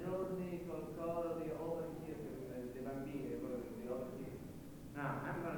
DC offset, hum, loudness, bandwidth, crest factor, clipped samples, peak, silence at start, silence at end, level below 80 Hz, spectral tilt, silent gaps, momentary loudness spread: under 0.1%; none; -45 LUFS; 19.5 kHz; 16 dB; under 0.1%; -28 dBFS; 0 s; 0 s; -64 dBFS; -7.5 dB/octave; none; 7 LU